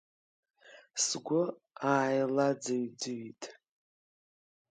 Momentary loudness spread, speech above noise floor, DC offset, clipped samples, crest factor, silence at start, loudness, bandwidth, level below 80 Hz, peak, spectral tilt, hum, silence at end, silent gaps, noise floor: 14 LU; over 58 dB; under 0.1%; under 0.1%; 22 dB; 0.65 s; -32 LUFS; 9.6 kHz; -86 dBFS; -12 dBFS; -3.5 dB/octave; none; 1.2 s; none; under -90 dBFS